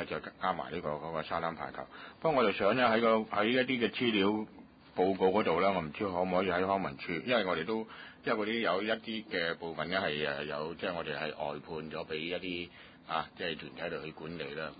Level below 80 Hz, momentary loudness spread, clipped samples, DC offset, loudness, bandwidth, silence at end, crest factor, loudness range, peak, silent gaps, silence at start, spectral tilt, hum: -64 dBFS; 12 LU; under 0.1%; under 0.1%; -33 LUFS; 4.9 kHz; 0 s; 18 dB; 8 LU; -16 dBFS; none; 0 s; -3 dB/octave; none